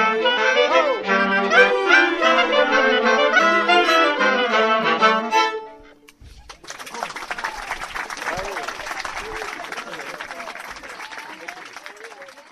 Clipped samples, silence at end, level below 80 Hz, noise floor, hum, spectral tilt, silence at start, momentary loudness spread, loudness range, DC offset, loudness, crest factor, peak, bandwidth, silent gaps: under 0.1%; 0.1 s; -52 dBFS; -46 dBFS; none; -2.5 dB/octave; 0 s; 19 LU; 15 LU; under 0.1%; -18 LUFS; 20 dB; 0 dBFS; 14 kHz; none